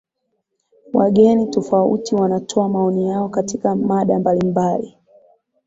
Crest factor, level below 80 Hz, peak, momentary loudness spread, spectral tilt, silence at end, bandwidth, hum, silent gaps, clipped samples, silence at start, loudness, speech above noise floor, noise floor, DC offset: 16 dB; -56 dBFS; -2 dBFS; 8 LU; -7.5 dB/octave; 0.75 s; 7.8 kHz; none; none; under 0.1%; 0.95 s; -17 LUFS; 56 dB; -73 dBFS; under 0.1%